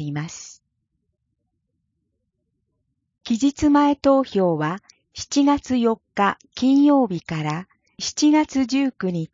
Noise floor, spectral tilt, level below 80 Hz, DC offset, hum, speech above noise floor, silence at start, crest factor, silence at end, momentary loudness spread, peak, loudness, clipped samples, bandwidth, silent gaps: -75 dBFS; -5.5 dB/octave; -52 dBFS; under 0.1%; none; 55 dB; 0 s; 16 dB; 0.05 s; 14 LU; -4 dBFS; -20 LUFS; under 0.1%; 7.6 kHz; none